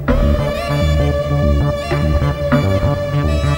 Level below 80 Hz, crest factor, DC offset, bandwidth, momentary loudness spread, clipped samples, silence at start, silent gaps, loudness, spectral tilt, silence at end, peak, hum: -20 dBFS; 14 dB; under 0.1%; 16.5 kHz; 3 LU; under 0.1%; 0 s; none; -16 LUFS; -7.5 dB/octave; 0 s; 0 dBFS; none